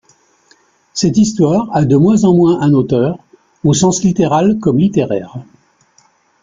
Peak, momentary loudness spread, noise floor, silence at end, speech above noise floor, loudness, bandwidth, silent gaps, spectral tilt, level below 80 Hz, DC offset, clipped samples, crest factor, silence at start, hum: -2 dBFS; 10 LU; -53 dBFS; 1 s; 42 dB; -12 LUFS; 9.4 kHz; none; -6.5 dB/octave; -46 dBFS; under 0.1%; under 0.1%; 12 dB; 0.95 s; none